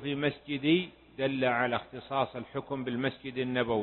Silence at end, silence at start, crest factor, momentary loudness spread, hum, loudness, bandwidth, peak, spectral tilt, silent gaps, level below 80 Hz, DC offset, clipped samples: 0 s; 0 s; 18 dB; 8 LU; none; -31 LUFS; 4.3 kHz; -14 dBFS; -10 dB/octave; none; -64 dBFS; under 0.1%; under 0.1%